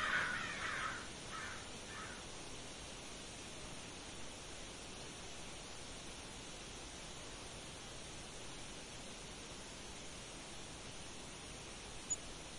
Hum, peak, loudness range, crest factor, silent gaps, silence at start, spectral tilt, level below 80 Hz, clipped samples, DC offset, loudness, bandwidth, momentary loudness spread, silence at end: none; -26 dBFS; 4 LU; 22 dB; none; 0 s; -2 dB/octave; -60 dBFS; under 0.1%; under 0.1%; -47 LUFS; 11.5 kHz; 8 LU; 0 s